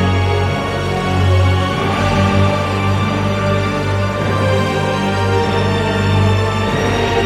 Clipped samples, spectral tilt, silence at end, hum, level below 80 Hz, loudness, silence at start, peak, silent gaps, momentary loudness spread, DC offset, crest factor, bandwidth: under 0.1%; -6.5 dB/octave; 0 s; none; -34 dBFS; -15 LUFS; 0 s; -2 dBFS; none; 4 LU; under 0.1%; 12 dB; 12 kHz